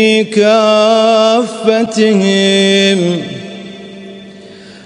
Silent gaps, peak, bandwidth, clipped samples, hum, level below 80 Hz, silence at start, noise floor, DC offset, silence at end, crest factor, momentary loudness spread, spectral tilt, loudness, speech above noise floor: none; 0 dBFS; 10.5 kHz; under 0.1%; none; -60 dBFS; 0 s; -34 dBFS; under 0.1%; 0.05 s; 12 dB; 21 LU; -4.5 dB/octave; -10 LUFS; 24 dB